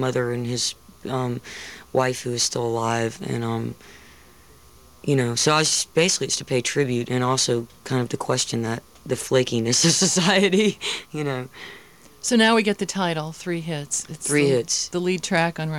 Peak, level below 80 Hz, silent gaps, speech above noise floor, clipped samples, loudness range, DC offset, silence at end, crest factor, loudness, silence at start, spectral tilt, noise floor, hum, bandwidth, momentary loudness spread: -4 dBFS; -58 dBFS; none; 28 dB; under 0.1%; 5 LU; 0.2%; 0 s; 20 dB; -22 LUFS; 0 s; -3.5 dB/octave; -51 dBFS; none; 18 kHz; 12 LU